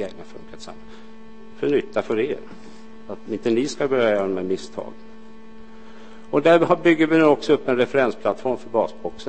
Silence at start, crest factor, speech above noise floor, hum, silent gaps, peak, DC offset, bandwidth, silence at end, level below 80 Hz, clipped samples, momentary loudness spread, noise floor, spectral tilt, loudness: 0 s; 20 dB; 23 dB; none; none; -2 dBFS; 1%; 8.8 kHz; 0 s; -58 dBFS; under 0.1%; 23 LU; -44 dBFS; -6 dB/octave; -20 LUFS